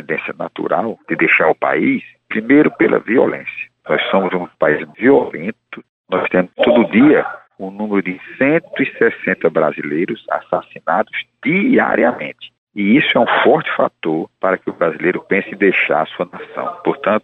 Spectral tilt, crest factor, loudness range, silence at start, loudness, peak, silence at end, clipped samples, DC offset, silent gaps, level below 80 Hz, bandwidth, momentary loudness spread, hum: -8.5 dB/octave; 14 dB; 3 LU; 0.1 s; -16 LUFS; -2 dBFS; 0.05 s; under 0.1%; under 0.1%; 5.89-6.04 s, 12.58-12.67 s; -60 dBFS; 4.1 kHz; 13 LU; none